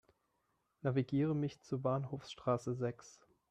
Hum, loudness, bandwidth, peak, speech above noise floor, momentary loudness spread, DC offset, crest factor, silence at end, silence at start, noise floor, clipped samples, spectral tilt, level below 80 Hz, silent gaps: none; -38 LUFS; 9.4 kHz; -20 dBFS; 44 dB; 7 LU; under 0.1%; 18 dB; 0.4 s; 0.85 s; -81 dBFS; under 0.1%; -7.5 dB/octave; -72 dBFS; none